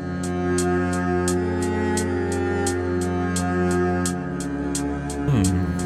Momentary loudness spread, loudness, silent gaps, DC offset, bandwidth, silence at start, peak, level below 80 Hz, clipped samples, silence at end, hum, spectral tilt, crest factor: 5 LU; -23 LUFS; none; under 0.1%; 13.5 kHz; 0 s; -6 dBFS; -40 dBFS; under 0.1%; 0 s; none; -5.5 dB/octave; 16 dB